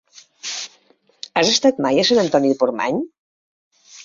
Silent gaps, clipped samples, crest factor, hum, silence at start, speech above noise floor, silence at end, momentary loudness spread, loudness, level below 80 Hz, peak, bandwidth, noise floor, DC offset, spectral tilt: 3.18-3.71 s; under 0.1%; 18 dB; none; 0.45 s; 40 dB; 0 s; 17 LU; -18 LUFS; -60 dBFS; -2 dBFS; 7.6 kHz; -57 dBFS; under 0.1%; -3.5 dB/octave